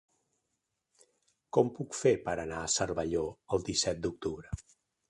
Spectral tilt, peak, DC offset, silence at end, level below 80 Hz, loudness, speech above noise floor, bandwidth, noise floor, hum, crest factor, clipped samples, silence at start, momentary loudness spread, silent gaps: -4 dB/octave; -12 dBFS; under 0.1%; 0.5 s; -54 dBFS; -32 LUFS; 51 dB; 11.5 kHz; -83 dBFS; none; 22 dB; under 0.1%; 1.55 s; 10 LU; none